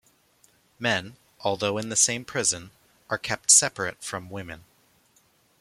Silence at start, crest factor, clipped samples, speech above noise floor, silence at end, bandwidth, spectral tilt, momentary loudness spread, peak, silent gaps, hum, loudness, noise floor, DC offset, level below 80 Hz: 0.8 s; 26 dB; under 0.1%; 38 dB; 1 s; 16 kHz; -1.5 dB/octave; 19 LU; -2 dBFS; none; none; -23 LUFS; -64 dBFS; under 0.1%; -64 dBFS